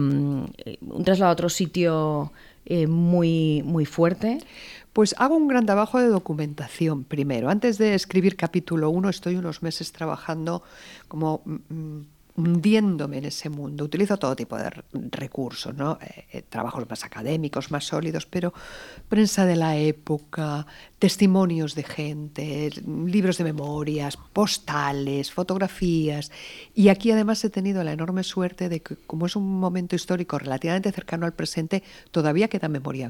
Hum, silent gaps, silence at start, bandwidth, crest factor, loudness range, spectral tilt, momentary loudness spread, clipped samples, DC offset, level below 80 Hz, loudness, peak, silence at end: none; none; 0 s; 17 kHz; 20 dB; 7 LU; -6 dB/octave; 13 LU; under 0.1%; under 0.1%; -54 dBFS; -24 LUFS; -4 dBFS; 0 s